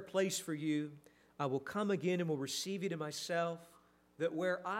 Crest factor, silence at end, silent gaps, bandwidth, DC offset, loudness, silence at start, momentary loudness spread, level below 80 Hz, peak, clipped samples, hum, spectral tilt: 16 dB; 0 s; none; 16 kHz; under 0.1%; -38 LUFS; 0 s; 5 LU; -82 dBFS; -22 dBFS; under 0.1%; 60 Hz at -65 dBFS; -4.5 dB/octave